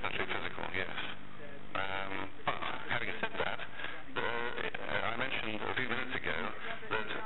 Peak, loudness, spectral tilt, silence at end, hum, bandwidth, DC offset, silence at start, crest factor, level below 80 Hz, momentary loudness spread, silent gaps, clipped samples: -22 dBFS; -37 LUFS; -6.5 dB/octave; 0 s; none; 8.4 kHz; 2%; 0 s; 18 dB; -62 dBFS; 7 LU; none; under 0.1%